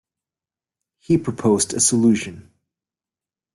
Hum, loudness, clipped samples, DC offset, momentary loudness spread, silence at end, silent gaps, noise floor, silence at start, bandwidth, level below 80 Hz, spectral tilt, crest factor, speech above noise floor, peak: none; -18 LUFS; under 0.1%; under 0.1%; 7 LU; 1.15 s; none; under -90 dBFS; 1.1 s; 12.5 kHz; -58 dBFS; -4.5 dB/octave; 18 dB; over 72 dB; -4 dBFS